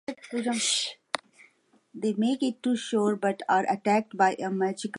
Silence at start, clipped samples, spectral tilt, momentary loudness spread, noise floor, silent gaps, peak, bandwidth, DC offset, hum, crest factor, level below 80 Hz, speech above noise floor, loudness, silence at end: 0.1 s; under 0.1%; -3.5 dB/octave; 8 LU; -63 dBFS; none; -8 dBFS; 11.5 kHz; under 0.1%; none; 20 dB; -80 dBFS; 36 dB; -27 LUFS; 0 s